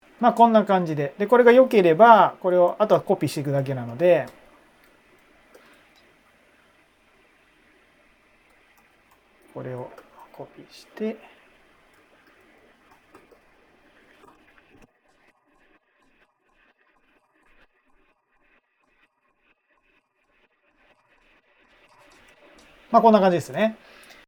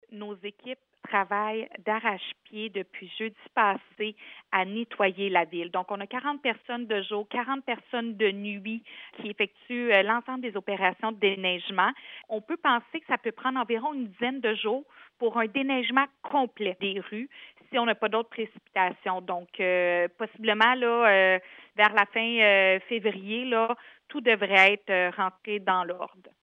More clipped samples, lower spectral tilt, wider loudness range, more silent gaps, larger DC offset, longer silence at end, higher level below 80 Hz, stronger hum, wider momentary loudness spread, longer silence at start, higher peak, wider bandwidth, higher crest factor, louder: neither; first, -7 dB/octave vs -5.5 dB/octave; first, 25 LU vs 8 LU; neither; neither; first, 0.55 s vs 0.35 s; first, -68 dBFS vs -84 dBFS; neither; first, 27 LU vs 15 LU; about the same, 0.2 s vs 0.1 s; first, 0 dBFS vs -6 dBFS; first, 18.5 kHz vs 8 kHz; about the same, 24 dB vs 22 dB; first, -19 LUFS vs -27 LUFS